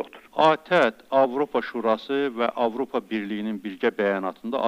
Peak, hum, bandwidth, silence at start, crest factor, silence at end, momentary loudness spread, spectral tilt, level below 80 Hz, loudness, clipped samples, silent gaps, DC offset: -6 dBFS; none; 15.5 kHz; 0 s; 18 dB; 0 s; 9 LU; -6 dB/octave; -70 dBFS; -24 LUFS; under 0.1%; none; under 0.1%